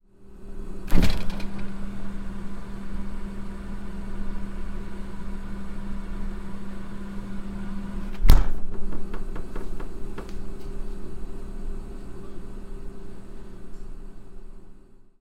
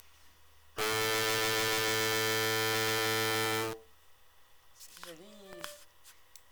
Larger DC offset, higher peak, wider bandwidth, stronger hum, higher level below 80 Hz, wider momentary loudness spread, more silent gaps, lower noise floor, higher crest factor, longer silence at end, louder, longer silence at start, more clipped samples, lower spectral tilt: neither; first, -2 dBFS vs -16 dBFS; second, 13.5 kHz vs over 20 kHz; neither; first, -28 dBFS vs -66 dBFS; about the same, 18 LU vs 20 LU; neither; second, -45 dBFS vs -63 dBFS; about the same, 20 dB vs 20 dB; second, 0.2 s vs 0.4 s; second, -34 LUFS vs -30 LUFS; second, 0.2 s vs 0.75 s; neither; first, -6.5 dB/octave vs -2 dB/octave